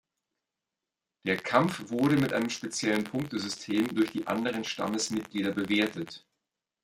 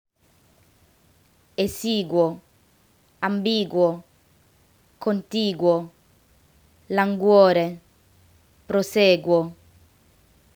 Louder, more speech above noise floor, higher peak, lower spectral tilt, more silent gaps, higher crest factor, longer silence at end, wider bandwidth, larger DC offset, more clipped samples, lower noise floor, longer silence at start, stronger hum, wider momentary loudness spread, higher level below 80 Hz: second, -29 LUFS vs -22 LUFS; first, 59 dB vs 40 dB; second, -8 dBFS vs -2 dBFS; about the same, -4.5 dB/octave vs -5.5 dB/octave; neither; about the same, 22 dB vs 22 dB; second, 0.65 s vs 1 s; second, 16.5 kHz vs over 20 kHz; neither; neither; first, -89 dBFS vs -61 dBFS; second, 1.25 s vs 1.6 s; neither; second, 7 LU vs 14 LU; second, -68 dBFS vs -62 dBFS